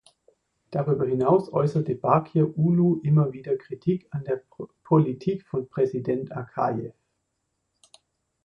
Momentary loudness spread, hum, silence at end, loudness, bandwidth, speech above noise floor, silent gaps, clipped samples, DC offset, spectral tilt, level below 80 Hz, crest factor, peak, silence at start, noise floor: 10 LU; none; 1.55 s; -25 LUFS; 6 kHz; 54 dB; none; under 0.1%; under 0.1%; -10.5 dB/octave; -62 dBFS; 20 dB; -4 dBFS; 0.7 s; -77 dBFS